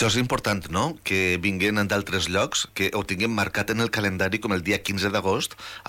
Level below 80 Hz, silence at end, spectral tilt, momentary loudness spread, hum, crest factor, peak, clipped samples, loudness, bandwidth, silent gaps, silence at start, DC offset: -52 dBFS; 0 s; -4 dB/octave; 3 LU; none; 12 dB; -12 dBFS; under 0.1%; -24 LUFS; 17 kHz; none; 0 s; under 0.1%